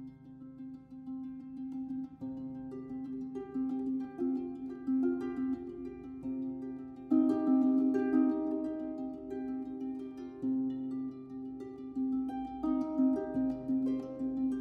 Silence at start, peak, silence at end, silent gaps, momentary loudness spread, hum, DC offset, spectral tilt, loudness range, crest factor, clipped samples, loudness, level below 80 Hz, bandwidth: 0 s; -18 dBFS; 0 s; none; 15 LU; none; under 0.1%; -9 dB/octave; 8 LU; 16 dB; under 0.1%; -35 LUFS; -66 dBFS; 4.2 kHz